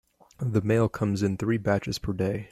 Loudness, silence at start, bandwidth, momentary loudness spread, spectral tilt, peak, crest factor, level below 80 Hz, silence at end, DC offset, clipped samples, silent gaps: -27 LUFS; 0.4 s; 13 kHz; 5 LU; -7 dB/octave; -10 dBFS; 16 dB; -50 dBFS; 0.05 s; under 0.1%; under 0.1%; none